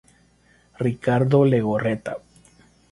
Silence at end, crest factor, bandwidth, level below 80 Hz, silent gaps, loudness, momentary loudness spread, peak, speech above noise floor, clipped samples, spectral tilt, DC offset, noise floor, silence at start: 0.75 s; 18 dB; 11.5 kHz; -56 dBFS; none; -21 LUFS; 14 LU; -4 dBFS; 38 dB; under 0.1%; -8.5 dB/octave; under 0.1%; -58 dBFS; 0.8 s